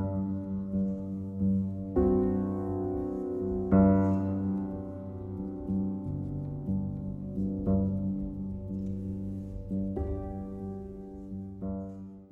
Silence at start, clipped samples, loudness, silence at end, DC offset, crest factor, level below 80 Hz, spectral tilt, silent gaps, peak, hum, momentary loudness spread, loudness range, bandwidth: 0 s; under 0.1%; -32 LUFS; 0.05 s; under 0.1%; 20 dB; -46 dBFS; -12 dB/octave; none; -12 dBFS; none; 13 LU; 9 LU; 2.3 kHz